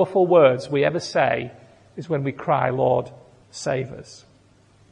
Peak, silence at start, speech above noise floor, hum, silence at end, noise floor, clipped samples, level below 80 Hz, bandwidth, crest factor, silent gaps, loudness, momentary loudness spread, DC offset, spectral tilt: -2 dBFS; 0 s; 35 dB; none; 0.75 s; -55 dBFS; under 0.1%; -60 dBFS; 10 kHz; 20 dB; none; -21 LUFS; 23 LU; under 0.1%; -6 dB/octave